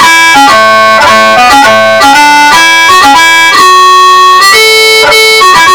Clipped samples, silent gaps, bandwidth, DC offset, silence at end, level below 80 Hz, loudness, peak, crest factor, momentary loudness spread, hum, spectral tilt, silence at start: 50%; none; over 20 kHz; under 0.1%; 0 s; -36 dBFS; -1 LUFS; 0 dBFS; 2 dB; 1 LU; none; -0.5 dB/octave; 0 s